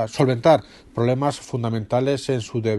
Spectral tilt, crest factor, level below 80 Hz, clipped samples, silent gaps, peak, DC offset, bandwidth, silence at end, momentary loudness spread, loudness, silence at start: -6.5 dB/octave; 18 dB; -54 dBFS; under 0.1%; none; -4 dBFS; under 0.1%; 12 kHz; 0 s; 8 LU; -21 LUFS; 0 s